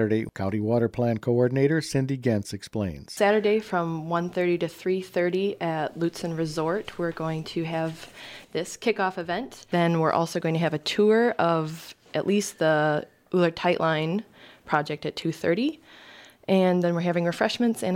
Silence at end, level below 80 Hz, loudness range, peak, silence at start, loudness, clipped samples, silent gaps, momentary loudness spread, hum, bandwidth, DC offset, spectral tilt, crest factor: 0 s; -60 dBFS; 5 LU; -8 dBFS; 0 s; -26 LUFS; under 0.1%; none; 9 LU; none; 16 kHz; under 0.1%; -6 dB/octave; 18 dB